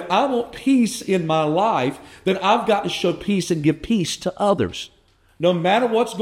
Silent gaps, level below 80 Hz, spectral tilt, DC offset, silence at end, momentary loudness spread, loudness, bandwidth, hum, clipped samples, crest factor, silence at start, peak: none; -52 dBFS; -5 dB/octave; under 0.1%; 0 s; 6 LU; -20 LUFS; 16 kHz; none; under 0.1%; 16 dB; 0 s; -4 dBFS